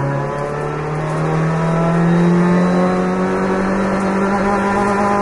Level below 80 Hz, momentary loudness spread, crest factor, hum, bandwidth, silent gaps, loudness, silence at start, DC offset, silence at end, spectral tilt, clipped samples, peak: -38 dBFS; 8 LU; 12 dB; none; 11.5 kHz; none; -16 LUFS; 0 s; under 0.1%; 0 s; -7.5 dB/octave; under 0.1%; -4 dBFS